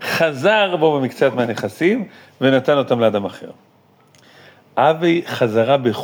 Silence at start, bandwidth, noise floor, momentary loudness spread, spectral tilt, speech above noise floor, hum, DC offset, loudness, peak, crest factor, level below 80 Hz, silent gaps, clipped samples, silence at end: 0 s; over 20 kHz; -53 dBFS; 9 LU; -6 dB/octave; 36 dB; none; under 0.1%; -17 LUFS; -2 dBFS; 16 dB; -72 dBFS; none; under 0.1%; 0 s